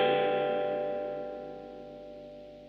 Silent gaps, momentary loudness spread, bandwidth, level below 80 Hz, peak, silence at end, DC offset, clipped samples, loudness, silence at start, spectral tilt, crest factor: none; 18 LU; 5.8 kHz; -66 dBFS; -16 dBFS; 0 s; under 0.1%; under 0.1%; -32 LUFS; 0 s; -7 dB/octave; 16 dB